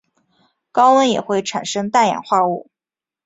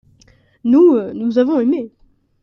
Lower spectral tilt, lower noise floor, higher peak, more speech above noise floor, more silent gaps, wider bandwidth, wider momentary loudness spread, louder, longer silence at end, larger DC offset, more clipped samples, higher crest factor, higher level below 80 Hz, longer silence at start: second, -4 dB/octave vs -8 dB/octave; first, -90 dBFS vs -52 dBFS; about the same, -2 dBFS vs -2 dBFS; first, 74 dB vs 38 dB; neither; first, 8 kHz vs 6.4 kHz; second, 10 LU vs 13 LU; about the same, -17 LUFS vs -15 LUFS; about the same, 0.65 s vs 0.55 s; neither; neither; about the same, 16 dB vs 14 dB; second, -64 dBFS vs -58 dBFS; about the same, 0.75 s vs 0.65 s